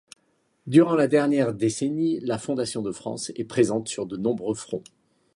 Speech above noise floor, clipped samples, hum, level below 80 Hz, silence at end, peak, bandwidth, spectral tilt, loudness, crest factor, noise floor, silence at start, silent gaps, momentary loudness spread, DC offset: 45 dB; under 0.1%; none; -64 dBFS; 0.55 s; -4 dBFS; 11.5 kHz; -5.5 dB/octave; -24 LUFS; 20 dB; -68 dBFS; 0.65 s; none; 12 LU; under 0.1%